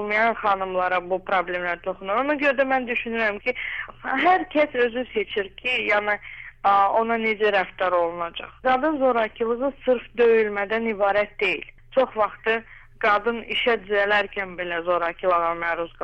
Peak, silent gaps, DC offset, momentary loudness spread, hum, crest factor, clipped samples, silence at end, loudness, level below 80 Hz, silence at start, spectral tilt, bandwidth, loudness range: -10 dBFS; none; under 0.1%; 8 LU; none; 14 dB; under 0.1%; 0 s; -23 LUFS; -52 dBFS; 0 s; -5.5 dB/octave; 8.2 kHz; 1 LU